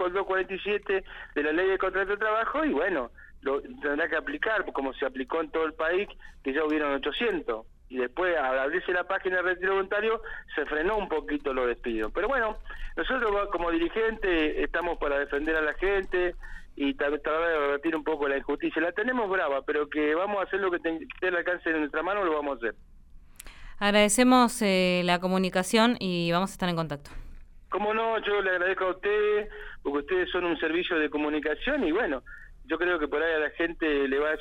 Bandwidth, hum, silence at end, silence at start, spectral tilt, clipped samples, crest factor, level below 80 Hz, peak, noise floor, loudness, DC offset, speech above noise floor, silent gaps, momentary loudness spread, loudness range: 16 kHz; none; 0 s; 0 s; -4.5 dB/octave; under 0.1%; 20 dB; -46 dBFS; -8 dBFS; -50 dBFS; -27 LUFS; under 0.1%; 22 dB; none; 8 LU; 5 LU